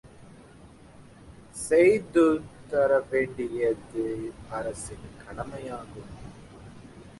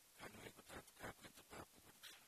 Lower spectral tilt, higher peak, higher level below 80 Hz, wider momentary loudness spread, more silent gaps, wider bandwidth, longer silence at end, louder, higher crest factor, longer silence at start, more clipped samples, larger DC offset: first, -5.5 dB/octave vs -3 dB/octave; first, -10 dBFS vs -40 dBFS; first, -54 dBFS vs -76 dBFS; first, 25 LU vs 5 LU; neither; second, 11.5 kHz vs 14 kHz; about the same, 0.05 s vs 0 s; first, -26 LUFS vs -58 LUFS; about the same, 18 dB vs 20 dB; about the same, 0.05 s vs 0 s; neither; neither